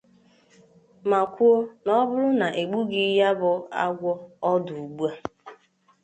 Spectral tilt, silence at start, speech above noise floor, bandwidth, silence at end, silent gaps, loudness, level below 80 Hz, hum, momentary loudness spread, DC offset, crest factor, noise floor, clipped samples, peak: -6.5 dB/octave; 1.05 s; 36 dB; 8.6 kHz; 0.5 s; none; -24 LUFS; -70 dBFS; none; 10 LU; under 0.1%; 16 dB; -59 dBFS; under 0.1%; -8 dBFS